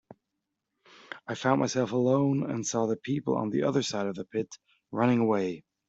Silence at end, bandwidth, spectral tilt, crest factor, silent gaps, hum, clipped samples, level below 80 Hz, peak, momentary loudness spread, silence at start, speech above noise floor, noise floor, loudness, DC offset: 0.3 s; 8 kHz; -5.5 dB/octave; 20 dB; none; none; under 0.1%; -70 dBFS; -10 dBFS; 11 LU; 1.1 s; 56 dB; -84 dBFS; -28 LUFS; under 0.1%